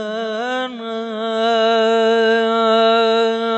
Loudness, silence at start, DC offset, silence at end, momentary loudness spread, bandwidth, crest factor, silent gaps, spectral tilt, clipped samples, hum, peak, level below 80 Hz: -16 LUFS; 0 s; under 0.1%; 0 s; 10 LU; 8.4 kHz; 12 dB; none; -4 dB/octave; under 0.1%; none; -4 dBFS; -80 dBFS